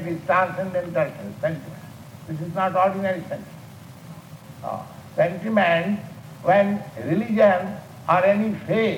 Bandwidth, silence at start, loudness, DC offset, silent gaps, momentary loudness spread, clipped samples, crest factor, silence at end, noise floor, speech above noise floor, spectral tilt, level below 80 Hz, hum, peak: 17 kHz; 0 s; -22 LUFS; under 0.1%; none; 23 LU; under 0.1%; 18 dB; 0 s; -42 dBFS; 20 dB; -7 dB/octave; -62 dBFS; none; -4 dBFS